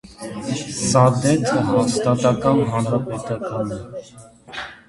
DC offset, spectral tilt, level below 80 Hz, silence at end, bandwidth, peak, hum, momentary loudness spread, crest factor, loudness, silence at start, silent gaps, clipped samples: under 0.1%; -5.5 dB/octave; -50 dBFS; 0.15 s; 11.5 kHz; 0 dBFS; none; 17 LU; 20 dB; -19 LUFS; 0.05 s; none; under 0.1%